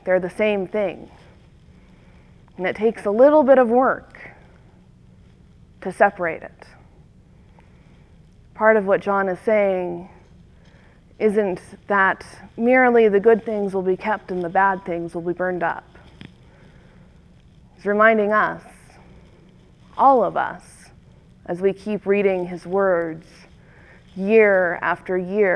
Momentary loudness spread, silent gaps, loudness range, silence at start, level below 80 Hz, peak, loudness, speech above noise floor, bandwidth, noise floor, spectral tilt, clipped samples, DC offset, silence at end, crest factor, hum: 17 LU; none; 7 LU; 0.05 s; -54 dBFS; -2 dBFS; -19 LUFS; 31 dB; 11 kHz; -50 dBFS; -7 dB/octave; under 0.1%; under 0.1%; 0 s; 20 dB; none